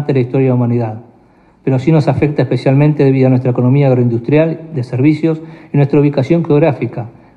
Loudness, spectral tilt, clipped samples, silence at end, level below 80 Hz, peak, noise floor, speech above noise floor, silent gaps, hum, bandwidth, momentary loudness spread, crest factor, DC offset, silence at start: -13 LUFS; -10 dB/octave; under 0.1%; 0.25 s; -50 dBFS; 0 dBFS; -47 dBFS; 35 dB; none; none; 6.6 kHz; 10 LU; 12 dB; under 0.1%; 0 s